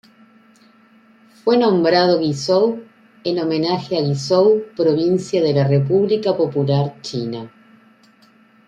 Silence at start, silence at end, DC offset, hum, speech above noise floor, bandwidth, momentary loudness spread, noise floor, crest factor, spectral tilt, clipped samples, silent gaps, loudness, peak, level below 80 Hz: 1.45 s; 1.2 s; under 0.1%; none; 35 dB; 9.4 kHz; 11 LU; -52 dBFS; 16 dB; -6.5 dB/octave; under 0.1%; none; -18 LUFS; -2 dBFS; -62 dBFS